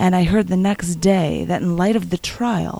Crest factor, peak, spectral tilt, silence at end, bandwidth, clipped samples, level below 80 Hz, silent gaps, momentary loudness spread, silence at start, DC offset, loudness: 14 dB; -2 dBFS; -6 dB/octave; 0 s; 14.5 kHz; under 0.1%; -38 dBFS; none; 4 LU; 0 s; under 0.1%; -19 LUFS